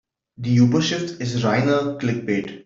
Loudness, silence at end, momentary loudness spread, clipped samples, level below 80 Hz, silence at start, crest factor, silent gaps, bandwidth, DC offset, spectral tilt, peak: -21 LUFS; 0.05 s; 8 LU; under 0.1%; -58 dBFS; 0.4 s; 16 dB; none; 7.6 kHz; under 0.1%; -6 dB/octave; -4 dBFS